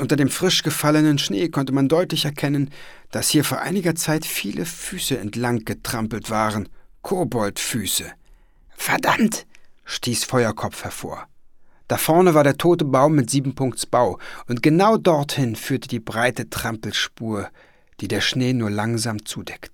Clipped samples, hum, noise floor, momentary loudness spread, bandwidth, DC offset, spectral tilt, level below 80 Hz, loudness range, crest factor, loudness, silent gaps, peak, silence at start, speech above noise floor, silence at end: under 0.1%; none; -50 dBFS; 13 LU; 19 kHz; under 0.1%; -4.5 dB/octave; -50 dBFS; 5 LU; 18 dB; -21 LUFS; none; -2 dBFS; 0 s; 29 dB; 0.05 s